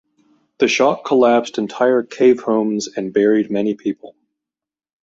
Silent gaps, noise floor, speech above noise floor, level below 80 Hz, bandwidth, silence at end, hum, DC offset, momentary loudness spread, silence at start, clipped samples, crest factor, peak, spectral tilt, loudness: none; -88 dBFS; 72 dB; -64 dBFS; 7.8 kHz; 0.95 s; none; under 0.1%; 9 LU; 0.6 s; under 0.1%; 16 dB; -2 dBFS; -5 dB/octave; -17 LUFS